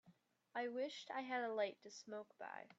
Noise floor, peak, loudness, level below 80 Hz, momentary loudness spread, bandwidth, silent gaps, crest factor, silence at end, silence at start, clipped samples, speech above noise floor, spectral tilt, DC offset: -73 dBFS; -30 dBFS; -46 LUFS; under -90 dBFS; 11 LU; 8 kHz; none; 18 dB; 0.05 s; 0.05 s; under 0.1%; 27 dB; -3 dB/octave; under 0.1%